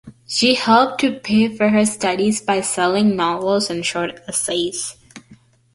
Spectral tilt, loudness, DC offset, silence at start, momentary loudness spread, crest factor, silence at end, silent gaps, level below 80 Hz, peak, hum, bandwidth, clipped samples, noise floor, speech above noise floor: -3.5 dB/octave; -18 LUFS; under 0.1%; 0.05 s; 8 LU; 16 dB; 0.4 s; none; -56 dBFS; -2 dBFS; none; 11.5 kHz; under 0.1%; -50 dBFS; 32 dB